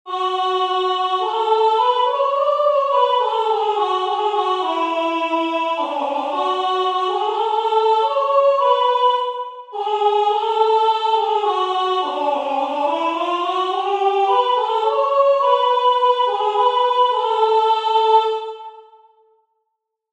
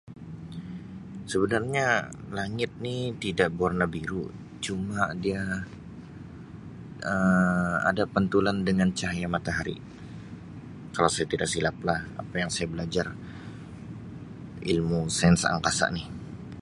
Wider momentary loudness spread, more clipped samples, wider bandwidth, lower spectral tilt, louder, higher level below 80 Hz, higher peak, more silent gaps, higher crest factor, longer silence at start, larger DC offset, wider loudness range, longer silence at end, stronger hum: second, 5 LU vs 19 LU; neither; second, 9.6 kHz vs 11.5 kHz; second, -1.5 dB/octave vs -5 dB/octave; first, -18 LUFS vs -27 LUFS; second, -84 dBFS vs -50 dBFS; about the same, -4 dBFS vs -6 dBFS; neither; second, 14 dB vs 22 dB; about the same, 0.05 s vs 0.05 s; neither; about the same, 3 LU vs 5 LU; first, 1.3 s vs 0 s; neither